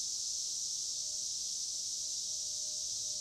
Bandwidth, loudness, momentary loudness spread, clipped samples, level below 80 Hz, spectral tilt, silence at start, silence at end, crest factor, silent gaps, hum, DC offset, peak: 16 kHz; -35 LUFS; 1 LU; under 0.1%; -74 dBFS; 2.5 dB/octave; 0 s; 0 s; 14 dB; none; none; under 0.1%; -26 dBFS